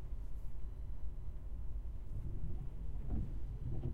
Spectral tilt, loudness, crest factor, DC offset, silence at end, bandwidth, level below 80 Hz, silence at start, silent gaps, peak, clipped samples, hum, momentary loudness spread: -9.5 dB/octave; -47 LUFS; 12 dB; under 0.1%; 0 s; 3.3 kHz; -44 dBFS; 0 s; none; -28 dBFS; under 0.1%; none; 6 LU